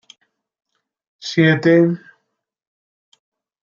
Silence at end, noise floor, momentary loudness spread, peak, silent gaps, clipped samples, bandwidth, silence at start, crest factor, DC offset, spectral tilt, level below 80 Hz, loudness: 1.65 s; -75 dBFS; 17 LU; -2 dBFS; none; under 0.1%; 7.2 kHz; 1.25 s; 18 dB; under 0.1%; -7 dB/octave; -66 dBFS; -15 LUFS